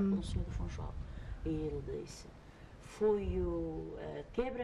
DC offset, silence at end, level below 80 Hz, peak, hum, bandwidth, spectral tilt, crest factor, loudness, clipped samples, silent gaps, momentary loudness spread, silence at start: under 0.1%; 0 s; -46 dBFS; -22 dBFS; none; 12 kHz; -7.5 dB/octave; 16 dB; -39 LUFS; under 0.1%; none; 19 LU; 0 s